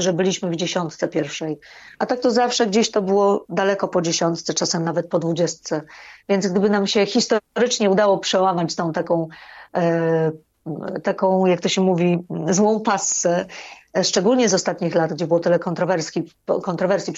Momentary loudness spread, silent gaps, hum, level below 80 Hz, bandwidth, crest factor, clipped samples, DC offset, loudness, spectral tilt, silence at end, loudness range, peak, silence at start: 10 LU; none; none; -64 dBFS; 8 kHz; 14 dB; under 0.1%; under 0.1%; -20 LUFS; -4.5 dB/octave; 0 s; 2 LU; -6 dBFS; 0 s